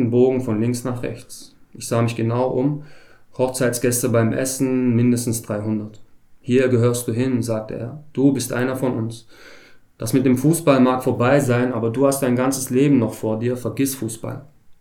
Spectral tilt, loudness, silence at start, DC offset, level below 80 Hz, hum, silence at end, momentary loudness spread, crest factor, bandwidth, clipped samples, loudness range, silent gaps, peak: -6 dB/octave; -20 LUFS; 0 s; under 0.1%; -56 dBFS; none; 0.05 s; 14 LU; 16 dB; 19 kHz; under 0.1%; 5 LU; none; -2 dBFS